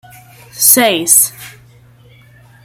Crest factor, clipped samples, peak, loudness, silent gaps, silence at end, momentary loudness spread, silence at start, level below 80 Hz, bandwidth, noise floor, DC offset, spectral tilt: 16 dB; 0.3%; 0 dBFS; -9 LUFS; none; 1.15 s; 5 LU; 0.55 s; -56 dBFS; over 20 kHz; -43 dBFS; under 0.1%; -1 dB/octave